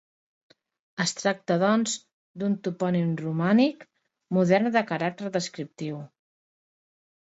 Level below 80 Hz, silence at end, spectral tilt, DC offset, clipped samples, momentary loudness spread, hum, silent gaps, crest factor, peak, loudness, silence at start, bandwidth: -74 dBFS; 1.25 s; -5.5 dB/octave; under 0.1%; under 0.1%; 13 LU; none; 2.13-2.34 s; 20 dB; -8 dBFS; -26 LUFS; 1 s; 8.2 kHz